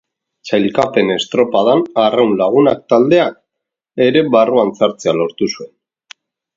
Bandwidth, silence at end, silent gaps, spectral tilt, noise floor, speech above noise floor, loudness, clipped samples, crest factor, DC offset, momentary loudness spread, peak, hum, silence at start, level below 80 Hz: 7.8 kHz; 0.9 s; none; -5.5 dB/octave; -80 dBFS; 67 dB; -14 LUFS; under 0.1%; 14 dB; under 0.1%; 8 LU; 0 dBFS; none; 0.45 s; -56 dBFS